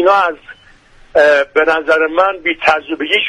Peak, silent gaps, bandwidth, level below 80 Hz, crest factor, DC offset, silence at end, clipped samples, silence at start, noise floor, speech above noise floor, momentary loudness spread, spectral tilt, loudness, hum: 0 dBFS; none; 11 kHz; -48 dBFS; 14 dB; under 0.1%; 0 s; under 0.1%; 0 s; -44 dBFS; 31 dB; 7 LU; -3 dB/octave; -13 LUFS; none